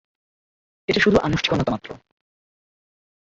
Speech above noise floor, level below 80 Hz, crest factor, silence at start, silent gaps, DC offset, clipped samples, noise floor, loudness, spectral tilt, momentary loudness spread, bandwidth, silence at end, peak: over 70 dB; -46 dBFS; 20 dB; 0.9 s; none; under 0.1%; under 0.1%; under -90 dBFS; -20 LUFS; -5.5 dB/octave; 15 LU; 8 kHz; 1.3 s; -4 dBFS